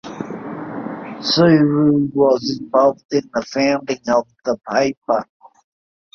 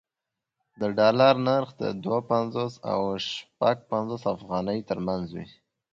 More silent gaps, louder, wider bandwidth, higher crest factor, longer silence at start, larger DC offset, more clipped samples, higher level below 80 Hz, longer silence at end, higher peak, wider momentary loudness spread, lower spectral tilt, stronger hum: first, 3.05-3.09 s, 4.97-5.02 s vs none; first, -17 LUFS vs -26 LUFS; second, 6.8 kHz vs 7.6 kHz; about the same, 16 dB vs 20 dB; second, 0.05 s vs 0.8 s; neither; neither; about the same, -58 dBFS vs -62 dBFS; first, 0.9 s vs 0.45 s; first, -2 dBFS vs -6 dBFS; first, 16 LU vs 12 LU; about the same, -6 dB/octave vs -6.5 dB/octave; neither